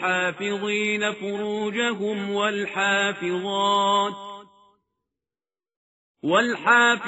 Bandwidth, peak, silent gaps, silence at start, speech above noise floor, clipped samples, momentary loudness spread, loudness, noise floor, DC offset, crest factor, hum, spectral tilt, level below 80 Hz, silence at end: 8 kHz; -6 dBFS; 5.76-6.15 s; 0 s; over 67 dB; under 0.1%; 9 LU; -23 LUFS; under -90 dBFS; under 0.1%; 18 dB; none; -1.5 dB/octave; -72 dBFS; 0 s